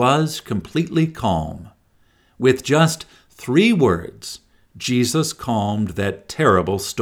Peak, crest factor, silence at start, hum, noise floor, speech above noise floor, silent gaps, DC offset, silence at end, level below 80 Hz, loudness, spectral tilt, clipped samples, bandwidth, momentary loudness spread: -2 dBFS; 18 dB; 0 s; none; -58 dBFS; 39 dB; none; under 0.1%; 0 s; -46 dBFS; -19 LUFS; -5.5 dB/octave; under 0.1%; 17.5 kHz; 16 LU